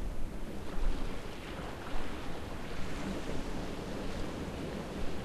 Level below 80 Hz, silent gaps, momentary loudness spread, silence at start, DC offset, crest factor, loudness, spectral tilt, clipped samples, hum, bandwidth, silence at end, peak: -40 dBFS; none; 4 LU; 0 s; under 0.1%; 16 dB; -41 LUFS; -5.5 dB/octave; under 0.1%; none; 13 kHz; 0 s; -18 dBFS